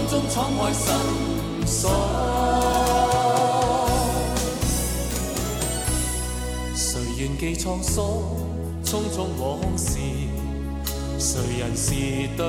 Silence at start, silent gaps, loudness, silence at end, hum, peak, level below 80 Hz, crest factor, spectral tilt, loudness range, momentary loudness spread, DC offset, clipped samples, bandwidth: 0 s; none; -24 LUFS; 0 s; none; -10 dBFS; -32 dBFS; 14 dB; -4.5 dB/octave; 5 LU; 8 LU; under 0.1%; under 0.1%; 17.5 kHz